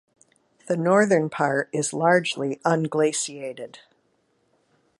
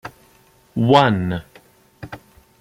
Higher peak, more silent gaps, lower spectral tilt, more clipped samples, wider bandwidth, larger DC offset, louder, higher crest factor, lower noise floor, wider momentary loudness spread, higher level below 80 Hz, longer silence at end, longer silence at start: second, -6 dBFS vs -2 dBFS; neither; second, -4.5 dB/octave vs -7 dB/octave; neither; second, 11.5 kHz vs 15.5 kHz; neither; second, -22 LUFS vs -18 LUFS; about the same, 18 dB vs 20 dB; first, -68 dBFS vs -54 dBFS; second, 15 LU vs 25 LU; second, -74 dBFS vs -52 dBFS; first, 1.25 s vs 0.45 s; first, 0.65 s vs 0.05 s